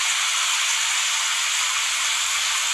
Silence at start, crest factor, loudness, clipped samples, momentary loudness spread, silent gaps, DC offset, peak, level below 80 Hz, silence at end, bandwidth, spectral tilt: 0 s; 14 dB; -19 LUFS; under 0.1%; 1 LU; none; under 0.1%; -8 dBFS; -64 dBFS; 0 s; 16 kHz; 5.5 dB/octave